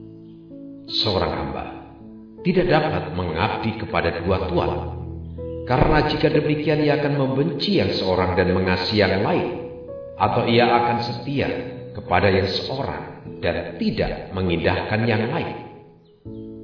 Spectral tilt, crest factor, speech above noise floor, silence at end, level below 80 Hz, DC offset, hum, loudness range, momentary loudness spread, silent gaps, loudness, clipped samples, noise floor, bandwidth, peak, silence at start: -7.5 dB/octave; 20 dB; 27 dB; 0 s; -40 dBFS; under 0.1%; none; 4 LU; 17 LU; none; -21 LUFS; under 0.1%; -48 dBFS; 5.4 kHz; -2 dBFS; 0 s